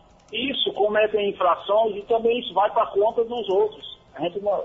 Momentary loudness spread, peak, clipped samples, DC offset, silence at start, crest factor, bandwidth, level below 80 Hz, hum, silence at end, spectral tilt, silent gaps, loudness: 8 LU; -8 dBFS; under 0.1%; under 0.1%; 0.3 s; 14 dB; 6.2 kHz; -58 dBFS; none; 0 s; -6 dB/octave; none; -23 LUFS